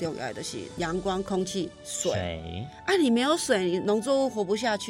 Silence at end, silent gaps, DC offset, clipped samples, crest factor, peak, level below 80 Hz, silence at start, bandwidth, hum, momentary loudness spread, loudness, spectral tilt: 0 s; none; under 0.1%; under 0.1%; 18 dB; -10 dBFS; -54 dBFS; 0 s; 16 kHz; none; 11 LU; -27 LUFS; -4 dB/octave